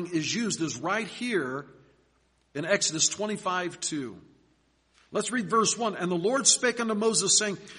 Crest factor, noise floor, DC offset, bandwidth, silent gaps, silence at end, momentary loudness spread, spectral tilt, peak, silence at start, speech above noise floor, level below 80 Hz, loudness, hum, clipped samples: 24 dB; -68 dBFS; under 0.1%; 10.5 kHz; none; 0 s; 13 LU; -2 dB/octave; -6 dBFS; 0 s; 40 dB; -70 dBFS; -26 LUFS; none; under 0.1%